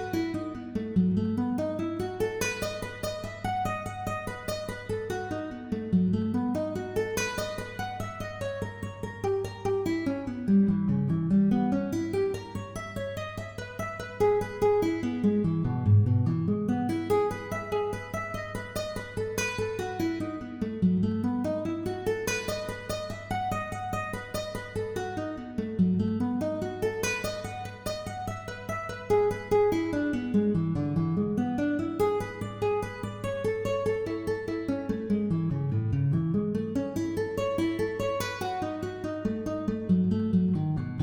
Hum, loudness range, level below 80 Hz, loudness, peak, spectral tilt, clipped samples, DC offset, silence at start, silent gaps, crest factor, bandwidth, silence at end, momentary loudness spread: none; 5 LU; -52 dBFS; -30 LUFS; -12 dBFS; -6.5 dB/octave; under 0.1%; under 0.1%; 0 s; none; 16 dB; over 20 kHz; 0 s; 9 LU